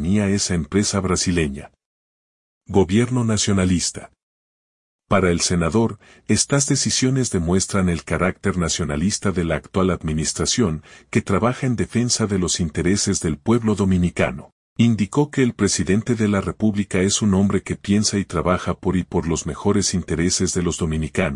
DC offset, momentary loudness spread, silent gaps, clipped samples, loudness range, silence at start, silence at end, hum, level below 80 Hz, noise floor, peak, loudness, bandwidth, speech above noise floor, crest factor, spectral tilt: under 0.1%; 5 LU; 1.86-2.61 s, 4.23-4.99 s, 14.52-14.76 s; under 0.1%; 2 LU; 0 s; 0 s; none; -42 dBFS; under -90 dBFS; -2 dBFS; -20 LUFS; 11 kHz; over 70 dB; 18 dB; -4.5 dB/octave